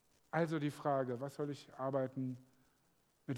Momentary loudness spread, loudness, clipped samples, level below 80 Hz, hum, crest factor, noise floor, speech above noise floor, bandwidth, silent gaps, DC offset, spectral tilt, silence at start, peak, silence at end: 8 LU; -40 LUFS; under 0.1%; -84 dBFS; none; 20 dB; -75 dBFS; 37 dB; 18 kHz; none; under 0.1%; -7.5 dB/octave; 0.35 s; -20 dBFS; 0 s